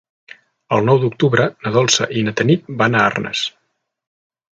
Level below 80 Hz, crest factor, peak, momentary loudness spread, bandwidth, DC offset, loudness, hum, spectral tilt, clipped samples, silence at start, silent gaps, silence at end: -56 dBFS; 18 dB; 0 dBFS; 6 LU; 9.2 kHz; under 0.1%; -16 LUFS; none; -4.5 dB/octave; under 0.1%; 0.7 s; none; 1.1 s